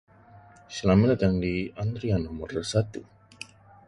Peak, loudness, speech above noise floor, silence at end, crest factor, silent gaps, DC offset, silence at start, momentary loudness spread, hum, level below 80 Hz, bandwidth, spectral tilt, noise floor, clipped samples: -8 dBFS; -26 LUFS; 27 dB; 0.45 s; 18 dB; none; under 0.1%; 0.35 s; 22 LU; none; -44 dBFS; 11 kHz; -7 dB/octave; -52 dBFS; under 0.1%